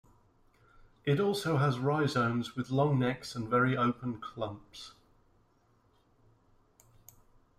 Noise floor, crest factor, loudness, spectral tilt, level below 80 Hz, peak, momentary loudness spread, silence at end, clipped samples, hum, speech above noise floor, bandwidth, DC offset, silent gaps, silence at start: -69 dBFS; 18 dB; -31 LUFS; -6.5 dB/octave; -64 dBFS; -16 dBFS; 12 LU; 2.7 s; under 0.1%; none; 38 dB; 14.5 kHz; under 0.1%; none; 1.05 s